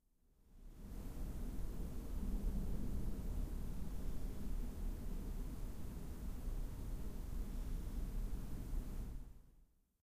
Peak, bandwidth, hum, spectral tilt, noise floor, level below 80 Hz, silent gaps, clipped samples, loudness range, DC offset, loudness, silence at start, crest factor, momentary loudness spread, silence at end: -30 dBFS; 15.5 kHz; none; -7 dB/octave; -71 dBFS; -44 dBFS; none; under 0.1%; 2 LU; under 0.1%; -48 LUFS; 0.5 s; 12 dB; 7 LU; 0.4 s